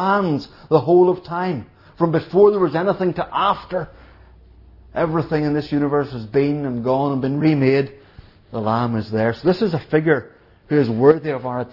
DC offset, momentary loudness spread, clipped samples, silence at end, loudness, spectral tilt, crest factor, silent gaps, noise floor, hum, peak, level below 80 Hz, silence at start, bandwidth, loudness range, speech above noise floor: under 0.1%; 10 LU; under 0.1%; 0.05 s; -19 LUFS; -9.5 dB/octave; 18 dB; none; -46 dBFS; none; 0 dBFS; -50 dBFS; 0 s; 5.8 kHz; 4 LU; 28 dB